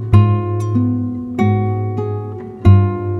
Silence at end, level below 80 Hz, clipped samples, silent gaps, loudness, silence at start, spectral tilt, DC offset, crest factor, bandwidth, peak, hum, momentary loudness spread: 0 s; -36 dBFS; under 0.1%; none; -16 LUFS; 0 s; -10 dB/octave; under 0.1%; 14 dB; 4.1 kHz; 0 dBFS; none; 11 LU